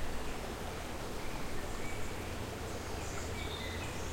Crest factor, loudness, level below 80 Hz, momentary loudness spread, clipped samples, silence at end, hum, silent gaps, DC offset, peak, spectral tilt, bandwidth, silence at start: 14 dB; -41 LUFS; -46 dBFS; 2 LU; under 0.1%; 0 s; none; none; under 0.1%; -24 dBFS; -4 dB/octave; 16.5 kHz; 0 s